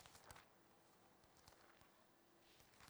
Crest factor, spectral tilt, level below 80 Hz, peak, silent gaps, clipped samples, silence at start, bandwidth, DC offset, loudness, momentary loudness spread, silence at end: 26 dB; -2.5 dB/octave; -84 dBFS; -42 dBFS; none; under 0.1%; 0 s; over 20 kHz; under 0.1%; -66 LUFS; 7 LU; 0 s